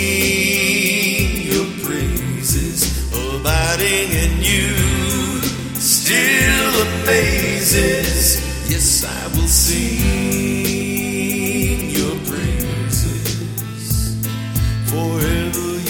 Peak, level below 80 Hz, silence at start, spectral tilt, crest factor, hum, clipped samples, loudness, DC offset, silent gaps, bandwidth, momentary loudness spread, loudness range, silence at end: 0 dBFS; -26 dBFS; 0 s; -3.5 dB/octave; 18 dB; none; under 0.1%; -16 LUFS; under 0.1%; none; 19 kHz; 8 LU; 6 LU; 0 s